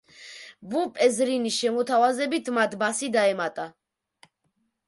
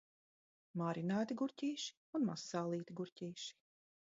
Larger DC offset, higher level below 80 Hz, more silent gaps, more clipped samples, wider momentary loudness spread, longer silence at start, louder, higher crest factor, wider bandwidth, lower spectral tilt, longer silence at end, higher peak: neither; first, -76 dBFS vs -88 dBFS; second, none vs 1.97-2.13 s, 3.12-3.16 s; neither; first, 18 LU vs 9 LU; second, 0.2 s vs 0.75 s; first, -24 LUFS vs -42 LUFS; about the same, 16 dB vs 16 dB; first, 11.5 kHz vs 7.6 kHz; second, -3 dB/octave vs -5.5 dB/octave; first, 1.15 s vs 0.6 s; first, -10 dBFS vs -26 dBFS